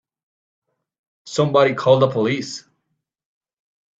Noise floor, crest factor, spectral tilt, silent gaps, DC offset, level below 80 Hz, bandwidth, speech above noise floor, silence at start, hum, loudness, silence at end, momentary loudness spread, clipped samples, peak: -75 dBFS; 20 dB; -5.5 dB/octave; none; under 0.1%; -66 dBFS; 8 kHz; 58 dB; 1.25 s; none; -18 LUFS; 1.4 s; 14 LU; under 0.1%; -2 dBFS